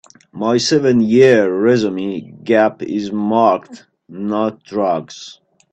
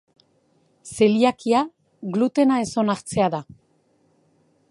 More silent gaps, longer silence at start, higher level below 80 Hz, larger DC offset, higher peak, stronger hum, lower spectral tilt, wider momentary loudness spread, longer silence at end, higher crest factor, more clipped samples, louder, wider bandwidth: neither; second, 0.35 s vs 0.85 s; about the same, -58 dBFS vs -60 dBFS; neither; first, 0 dBFS vs -4 dBFS; neither; about the same, -5.5 dB/octave vs -5.5 dB/octave; about the same, 14 LU vs 14 LU; second, 0.4 s vs 1.3 s; about the same, 16 dB vs 20 dB; neither; first, -15 LUFS vs -21 LUFS; second, 8.4 kHz vs 11.5 kHz